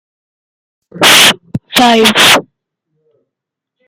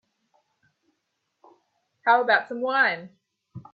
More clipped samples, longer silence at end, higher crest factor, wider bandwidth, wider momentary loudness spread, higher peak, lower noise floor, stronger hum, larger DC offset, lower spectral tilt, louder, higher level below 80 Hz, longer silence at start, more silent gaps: first, 0.5% vs under 0.1%; first, 1.45 s vs 0.15 s; second, 12 dB vs 22 dB; first, over 20 kHz vs 5 kHz; about the same, 8 LU vs 9 LU; first, 0 dBFS vs -6 dBFS; about the same, -79 dBFS vs -77 dBFS; neither; neither; second, -1.5 dB/octave vs -6 dB/octave; first, -6 LUFS vs -22 LUFS; first, -50 dBFS vs -76 dBFS; second, 0.95 s vs 2.05 s; neither